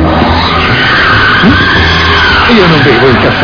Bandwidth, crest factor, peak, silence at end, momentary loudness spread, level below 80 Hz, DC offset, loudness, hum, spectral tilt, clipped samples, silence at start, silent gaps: 5.4 kHz; 6 dB; 0 dBFS; 0 s; 3 LU; -20 dBFS; under 0.1%; -5 LUFS; none; -6 dB/octave; 4%; 0 s; none